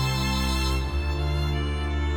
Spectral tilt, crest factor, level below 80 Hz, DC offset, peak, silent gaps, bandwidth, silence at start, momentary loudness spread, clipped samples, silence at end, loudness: -5 dB/octave; 10 dB; -28 dBFS; under 0.1%; -14 dBFS; none; 18.5 kHz; 0 s; 3 LU; under 0.1%; 0 s; -26 LUFS